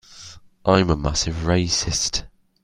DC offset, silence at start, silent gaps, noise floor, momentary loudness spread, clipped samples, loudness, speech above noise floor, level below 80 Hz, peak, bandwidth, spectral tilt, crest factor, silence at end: under 0.1%; 0.1 s; none; -43 dBFS; 21 LU; under 0.1%; -21 LUFS; 23 dB; -36 dBFS; 0 dBFS; 15.5 kHz; -4 dB/octave; 22 dB; 0.35 s